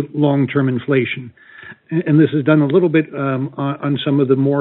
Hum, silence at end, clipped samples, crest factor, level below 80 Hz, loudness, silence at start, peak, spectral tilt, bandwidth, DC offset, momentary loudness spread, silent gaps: none; 0 s; under 0.1%; 16 dB; -64 dBFS; -16 LUFS; 0 s; 0 dBFS; -7 dB/octave; 4.1 kHz; under 0.1%; 9 LU; none